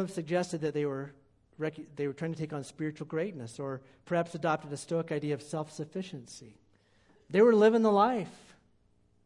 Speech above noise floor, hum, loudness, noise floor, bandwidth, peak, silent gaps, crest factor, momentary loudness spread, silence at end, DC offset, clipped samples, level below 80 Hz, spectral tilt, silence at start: 37 dB; none; -31 LUFS; -68 dBFS; 11.5 kHz; -12 dBFS; none; 18 dB; 17 LU; 0.9 s; under 0.1%; under 0.1%; -72 dBFS; -6.5 dB/octave; 0 s